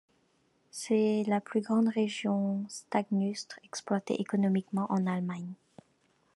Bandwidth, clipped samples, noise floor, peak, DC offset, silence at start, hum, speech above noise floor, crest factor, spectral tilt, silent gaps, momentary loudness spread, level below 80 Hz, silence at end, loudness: 12 kHz; under 0.1%; -71 dBFS; -14 dBFS; under 0.1%; 0.75 s; none; 41 dB; 18 dB; -6 dB/octave; none; 13 LU; -80 dBFS; 0.8 s; -31 LUFS